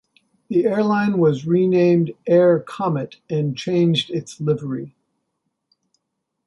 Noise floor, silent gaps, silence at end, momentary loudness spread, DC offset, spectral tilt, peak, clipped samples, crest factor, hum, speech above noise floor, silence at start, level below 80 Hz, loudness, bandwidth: -77 dBFS; none; 1.6 s; 11 LU; under 0.1%; -7.5 dB/octave; -4 dBFS; under 0.1%; 16 dB; none; 59 dB; 0.5 s; -64 dBFS; -19 LUFS; 11.5 kHz